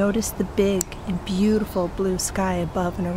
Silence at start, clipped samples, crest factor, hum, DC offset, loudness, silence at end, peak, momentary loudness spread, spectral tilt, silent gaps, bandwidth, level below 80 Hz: 0 s; under 0.1%; 18 dB; none; under 0.1%; -24 LUFS; 0 s; -4 dBFS; 5 LU; -5.5 dB/octave; none; 16 kHz; -38 dBFS